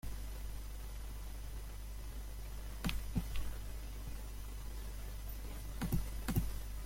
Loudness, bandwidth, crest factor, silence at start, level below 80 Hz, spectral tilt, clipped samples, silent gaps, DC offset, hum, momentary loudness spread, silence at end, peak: -45 LUFS; 16.5 kHz; 24 dB; 0.05 s; -44 dBFS; -5 dB/octave; under 0.1%; none; under 0.1%; none; 9 LU; 0 s; -18 dBFS